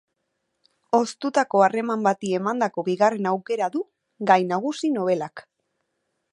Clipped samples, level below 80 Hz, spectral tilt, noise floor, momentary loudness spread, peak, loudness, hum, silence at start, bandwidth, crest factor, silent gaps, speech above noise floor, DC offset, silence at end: under 0.1%; -78 dBFS; -5.5 dB/octave; -77 dBFS; 8 LU; -2 dBFS; -23 LUFS; none; 0.95 s; 11 kHz; 22 dB; none; 54 dB; under 0.1%; 0.9 s